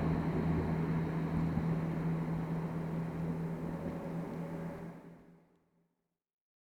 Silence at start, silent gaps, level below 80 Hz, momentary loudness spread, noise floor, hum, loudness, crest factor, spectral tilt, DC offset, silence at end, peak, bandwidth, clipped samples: 0 s; none; -54 dBFS; 9 LU; -84 dBFS; none; -37 LUFS; 16 dB; -9.5 dB/octave; under 0.1%; 1.35 s; -22 dBFS; 5.8 kHz; under 0.1%